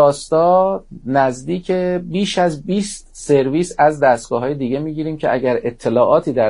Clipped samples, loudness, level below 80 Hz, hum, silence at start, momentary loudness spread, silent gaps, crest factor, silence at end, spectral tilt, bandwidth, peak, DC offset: under 0.1%; -17 LUFS; -46 dBFS; none; 0 s; 8 LU; none; 16 dB; 0 s; -5.5 dB/octave; 11 kHz; 0 dBFS; under 0.1%